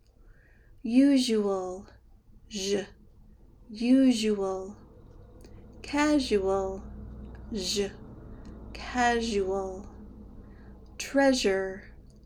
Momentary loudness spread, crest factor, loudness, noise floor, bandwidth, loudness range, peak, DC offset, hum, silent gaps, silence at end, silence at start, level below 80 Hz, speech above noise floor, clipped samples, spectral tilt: 24 LU; 18 dB; -27 LUFS; -56 dBFS; 15.5 kHz; 4 LU; -12 dBFS; under 0.1%; none; none; 0.25 s; 0.3 s; -50 dBFS; 29 dB; under 0.1%; -4 dB/octave